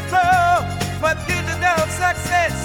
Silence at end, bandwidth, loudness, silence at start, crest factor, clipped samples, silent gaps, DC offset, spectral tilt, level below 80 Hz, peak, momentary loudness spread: 0 s; over 20 kHz; -18 LUFS; 0 s; 14 dB; under 0.1%; none; under 0.1%; -4 dB/octave; -38 dBFS; -4 dBFS; 6 LU